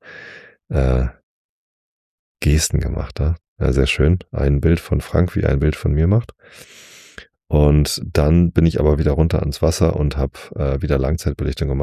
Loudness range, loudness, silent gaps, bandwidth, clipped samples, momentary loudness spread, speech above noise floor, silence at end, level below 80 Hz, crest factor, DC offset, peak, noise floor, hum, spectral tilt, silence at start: 4 LU; -18 LUFS; 1.23-2.35 s, 3.48-3.56 s; 14.5 kHz; under 0.1%; 9 LU; 26 dB; 0 s; -24 dBFS; 16 dB; under 0.1%; -2 dBFS; -43 dBFS; none; -6.5 dB/octave; 0.05 s